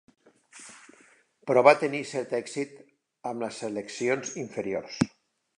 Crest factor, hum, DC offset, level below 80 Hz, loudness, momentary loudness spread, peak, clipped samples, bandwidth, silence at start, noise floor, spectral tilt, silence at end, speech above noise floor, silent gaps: 24 dB; none; under 0.1%; -68 dBFS; -27 LUFS; 22 LU; -4 dBFS; under 0.1%; 11 kHz; 0.55 s; -60 dBFS; -4.5 dB/octave; 0.5 s; 34 dB; none